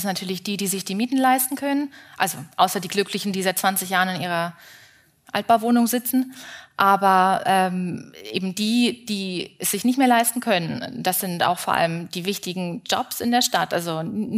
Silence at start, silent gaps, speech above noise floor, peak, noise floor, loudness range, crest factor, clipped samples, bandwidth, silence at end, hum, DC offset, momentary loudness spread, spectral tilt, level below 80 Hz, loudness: 0 s; none; 30 dB; -2 dBFS; -52 dBFS; 3 LU; 20 dB; under 0.1%; 16 kHz; 0 s; none; under 0.1%; 10 LU; -3.5 dB/octave; -68 dBFS; -22 LUFS